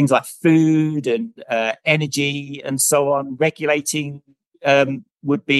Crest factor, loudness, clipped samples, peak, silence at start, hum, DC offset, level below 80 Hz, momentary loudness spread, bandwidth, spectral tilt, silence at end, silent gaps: 18 dB; -19 LUFS; under 0.1%; -2 dBFS; 0 s; none; under 0.1%; -66 dBFS; 9 LU; 13 kHz; -4.5 dB/octave; 0 s; 4.46-4.52 s